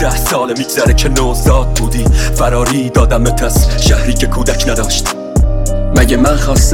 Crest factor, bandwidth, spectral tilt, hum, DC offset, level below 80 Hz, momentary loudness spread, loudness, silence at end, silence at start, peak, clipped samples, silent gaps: 10 dB; 17.5 kHz; -4.5 dB/octave; none; 2%; -14 dBFS; 4 LU; -12 LUFS; 0 s; 0 s; 0 dBFS; under 0.1%; none